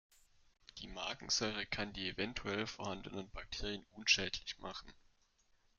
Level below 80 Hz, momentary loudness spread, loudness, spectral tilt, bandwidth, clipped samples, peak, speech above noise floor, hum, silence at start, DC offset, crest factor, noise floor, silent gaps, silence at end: -58 dBFS; 16 LU; -39 LUFS; -2 dB/octave; 11.5 kHz; under 0.1%; -16 dBFS; 33 dB; none; 0.75 s; under 0.1%; 26 dB; -74 dBFS; none; 0.85 s